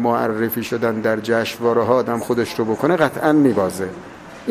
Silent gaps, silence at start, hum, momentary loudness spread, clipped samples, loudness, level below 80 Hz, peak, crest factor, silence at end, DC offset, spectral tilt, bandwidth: none; 0 s; none; 12 LU; under 0.1%; -19 LUFS; -54 dBFS; 0 dBFS; 18 dB; 0 s; under 0.1%; -6 dB/octave; 16 kHz